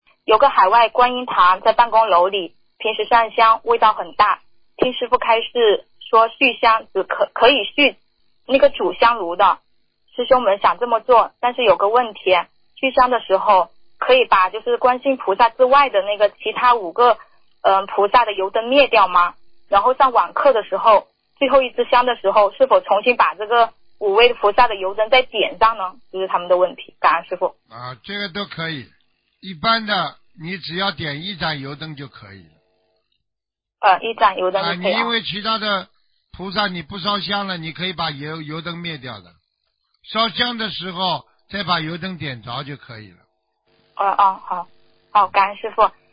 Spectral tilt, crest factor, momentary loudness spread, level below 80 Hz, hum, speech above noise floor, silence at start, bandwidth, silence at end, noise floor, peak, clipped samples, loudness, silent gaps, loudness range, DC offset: -9 dB/octave; 18 dB; 13 LU; -54 dBFS; none; 67 dB; 0.3 s; 5.2 kHz; 0.2 s; -84 dBFS; 0 dBFS; under 0.1%; -17 LUFS; none; 8 LU; under 0.1%